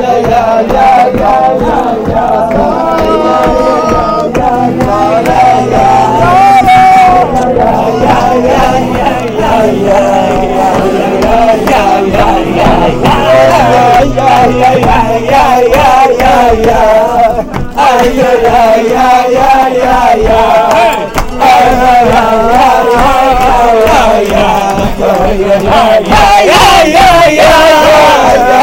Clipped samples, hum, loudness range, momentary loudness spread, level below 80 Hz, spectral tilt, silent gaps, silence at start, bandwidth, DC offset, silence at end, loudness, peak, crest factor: under 0.1%; none; 3 LU; 6 LU; -22 dBFS; -5 dB/octave; none; 0 s; 16.5 kHz; under 0.1%; 0 s; -6 LUFS; 0 dBFS; 6 dB